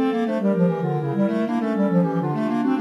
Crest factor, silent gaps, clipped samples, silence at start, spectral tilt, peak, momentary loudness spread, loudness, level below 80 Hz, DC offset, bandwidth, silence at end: 12 dB; none; under 0.1%; 0 s; -9 dB/octave; -8 dBFS; 3 LU; -22 LUFS; -72 dBFS; under 0.1%; 7.2 kHz; 0 s